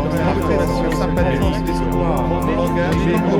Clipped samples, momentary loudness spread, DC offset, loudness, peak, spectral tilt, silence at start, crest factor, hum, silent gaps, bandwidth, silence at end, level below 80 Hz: under 0.1%; 2 LU; under 0.1%; -18 LUFS; -4 dBFS; -7 dB/octave; 0 s; 12 dB; none; none; 17.5 kHz; 0 s; -26 dBFS